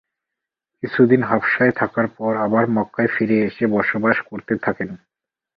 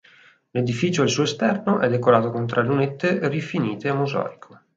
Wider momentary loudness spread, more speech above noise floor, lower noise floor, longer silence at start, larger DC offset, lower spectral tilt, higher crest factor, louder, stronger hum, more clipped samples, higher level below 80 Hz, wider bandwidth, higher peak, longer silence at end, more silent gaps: first, 10 LU vs 7 LU; first, 66 dB vs 32 dB; first, -84 dBFS vs -53 dBFS; first, 0.85 s vs 0.55 s; neither; first, -10 dB/octave vs -6 dB/octave; about the same, 18 dB vs 20 dB; first, -19 LUFS vs -22 LUFS; neither; neither; first, -58 dBFS vs -64 dBFS; second, 5.4 kHz vs 7.8 kHz; about the same, -2 dBFS vs -2 dBFS; first, 0.6 s vs 0.4 s; neither